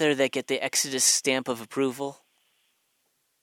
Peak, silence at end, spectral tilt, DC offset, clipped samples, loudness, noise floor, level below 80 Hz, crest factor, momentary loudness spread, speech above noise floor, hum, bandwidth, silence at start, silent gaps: -8 dBFS; 1.3 s; -1.5 dB/octave; under 0.1%; under 0.1%; -25 LUFS; -73 dBFS; -76 dBFS; 20 dB; 11 LU; 47 dB; none; 17 kHz; 0 s; none